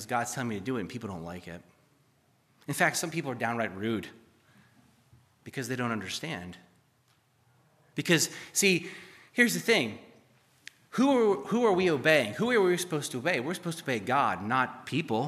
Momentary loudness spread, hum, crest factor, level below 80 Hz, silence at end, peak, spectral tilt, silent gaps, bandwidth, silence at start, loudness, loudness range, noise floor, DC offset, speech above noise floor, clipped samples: 16 LU; none; 22 dB; -72 dBFS; 0 s; -8 dBFS; -4 dB/octave; none; 15 kHz; 0 s; -28 LUFS; 11 LU; -68 dBFS; under 0.1%; 39 dB; under 0.1%